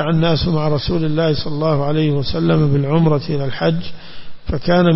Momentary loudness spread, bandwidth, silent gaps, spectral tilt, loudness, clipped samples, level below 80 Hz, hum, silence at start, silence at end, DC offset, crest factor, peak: 8 LU; 5.8 kHz; none; -11 dB/octave; -17 LUFS; under 0.1%; -34 dBFS; none; 0 s; 0 s; under 0.1%; 12 dB; -4 dBFS